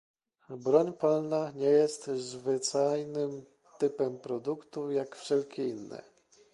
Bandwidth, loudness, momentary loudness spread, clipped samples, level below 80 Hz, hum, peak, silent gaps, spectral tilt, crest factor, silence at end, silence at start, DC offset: 11.5 kHz; -31 LUFS; 11 LU; under 0.1%; -78 dBFS; none; -12 dBFS; none; -5 dB/octave; 20 dB; 0.5 s; 0.5 s; under 0.1%